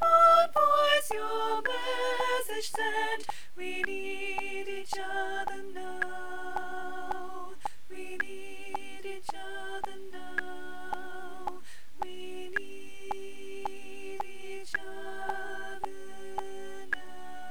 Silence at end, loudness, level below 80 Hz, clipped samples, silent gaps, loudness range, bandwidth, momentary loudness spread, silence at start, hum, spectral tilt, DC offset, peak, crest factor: 0 s; -32 LUFS; -66 dBFS; under 0.1%; none; 10 LU; over 20 kHz; 17 LU; 0 s; none; -2 dB/octave; 2%; -10 dBFS; 22 dB